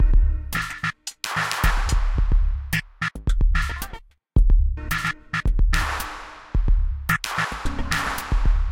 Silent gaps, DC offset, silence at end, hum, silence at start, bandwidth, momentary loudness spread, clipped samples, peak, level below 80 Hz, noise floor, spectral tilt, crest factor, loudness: none; under 0.1%; 0 s; none; 0 s; 17 kHz; 7 LU; under 0.1%; -4 dBFS; -22 dBFS; -41 dBFS; -4 dB/octave; 16 dB; -25 LUFS